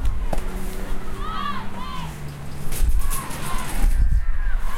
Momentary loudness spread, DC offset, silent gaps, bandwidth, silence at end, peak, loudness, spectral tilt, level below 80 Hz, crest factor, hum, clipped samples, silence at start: 9 LU; under 0.1%; none; 15.5 kHz; 0 s; -6 dBFS; -28 LUFS; -4.5 dB/octave; -22 dBFS; 12 dB; none; under 0.1%; 0 s